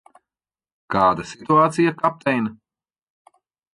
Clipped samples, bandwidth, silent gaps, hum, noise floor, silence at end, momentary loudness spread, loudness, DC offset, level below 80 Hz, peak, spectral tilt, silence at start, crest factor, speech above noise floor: under 0.1%; 11.5 kHz; none; none; under -90 dBFS; 1.2 s; 9 LU; -20 LUFS; under 0.1%; -56 dBFS; -4 dBFS; -6.5 dB/octave; 0.9 s; 18 dB; over 71 dB